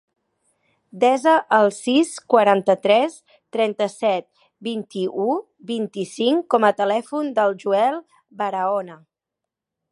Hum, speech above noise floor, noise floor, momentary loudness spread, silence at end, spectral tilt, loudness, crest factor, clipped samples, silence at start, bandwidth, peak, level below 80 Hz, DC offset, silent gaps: none; 65 dB; -85 dBFS; 12 LU; 0.95 s; -4.5 dB/octave; -20 LUFS; 20 dB; under 0.1%; 0.95 s; 11.5 kHz; -2 dBFS; -76 dBFS; under 0.1%; none